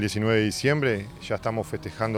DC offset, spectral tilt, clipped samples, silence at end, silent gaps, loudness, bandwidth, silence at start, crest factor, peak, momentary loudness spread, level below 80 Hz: under 0.1%; -5.5 dB/octave; under 0.1%; 0 s; none; -26 LUFS; 16 kHz; 0 s; 18 dB; -8 dBFS; 8 LU; -52 dBFS